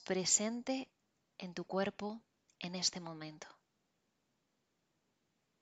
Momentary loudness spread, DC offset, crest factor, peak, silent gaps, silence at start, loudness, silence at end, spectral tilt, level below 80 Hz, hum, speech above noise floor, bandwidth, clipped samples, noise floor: 21 LU; under 0.1%; 24 dB; -18 dBFS; none; 0 s; -37 LUFS; 2.1 s; -2.5 dB/octave; -82 dBFS; none; 44 dB; 11.5 kHz; under 0.1%; -82 dBFS